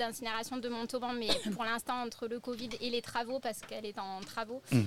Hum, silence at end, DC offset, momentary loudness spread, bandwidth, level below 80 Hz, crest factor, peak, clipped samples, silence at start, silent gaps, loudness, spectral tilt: none; 0 s; under 0.1%; 8 LU; 16.5 kHz; -64 dBFS; 22 dB; -14 dBFS; under 0.1%; 0 s; none; -37 LUFS; -4.5 dB/octave